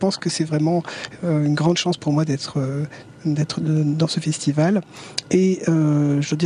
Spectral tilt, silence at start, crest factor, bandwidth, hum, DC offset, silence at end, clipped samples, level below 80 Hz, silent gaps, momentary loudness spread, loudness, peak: -6 dB/octave; 0 s; 16 dB; 10.5 kHz; none; under 0.1%; 0 s; under 0.1%; -60 dBFS; none; 9 LU; -21 LUFS; -4 dBFS